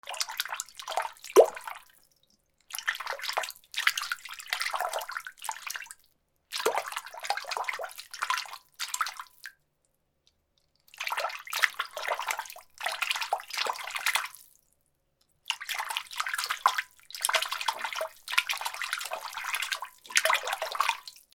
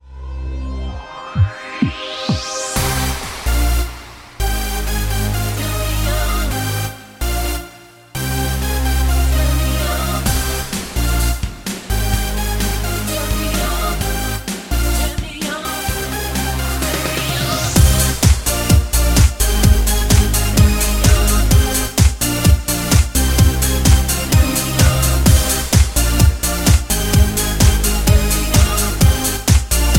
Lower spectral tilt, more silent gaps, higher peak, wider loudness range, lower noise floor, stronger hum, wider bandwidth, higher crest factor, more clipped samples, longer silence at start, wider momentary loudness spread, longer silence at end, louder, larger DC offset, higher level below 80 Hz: second, 1.5 dB/octave vs -4 dB/octave; neither; about the same, 0 dBFS vs 0 dBFS; about the same, 5 LU vs 6 LU; first, -75 dBFS vs -40 dBFS; neither; first, over 20 kHz vs 17 kHz; first, 32 dB vs 16 dB; neither; about the same, 0.05 s vs 0.05 s; about the same, 11 LU vs 9 LU; first, 0.15 s vs 0 s; second, -31 LUFS vs -16 LUFS; neither; second, -78 dBFS vs -18 dBFS